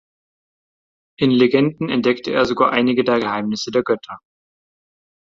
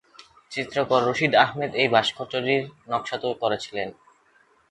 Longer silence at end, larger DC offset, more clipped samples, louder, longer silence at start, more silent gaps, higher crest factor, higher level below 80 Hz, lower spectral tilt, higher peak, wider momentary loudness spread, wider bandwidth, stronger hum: first, 1.05 s vs 0.8 s; neither; neither; first, -18 LUFS vs -24 LUFS; first, 1.2 s vs 0.5 s; neither; second, 18 dB vs 24 dB; first, -58 dBFS vs -64 dBFS; first, -6 dB/octave vs -4.5 dB/octave; about the same, -2 dBFS vs -2 dBFS; second, 8 LU vs 12 LU; second, 7.6 kHz vs 11.5 kHz; neither